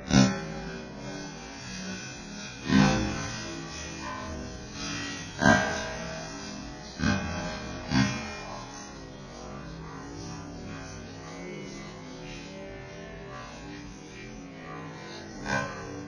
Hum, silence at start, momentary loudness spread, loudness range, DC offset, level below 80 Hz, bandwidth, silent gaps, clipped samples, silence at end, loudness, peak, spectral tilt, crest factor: none; 0 s; 18 LU; 13 LU; under 0.1%; -48 dBFS; 10.5 kHz; none; under 0.1%; 0 s; -32 LUFS; -6 dBFS; -4.5 dB/octave; 26 dB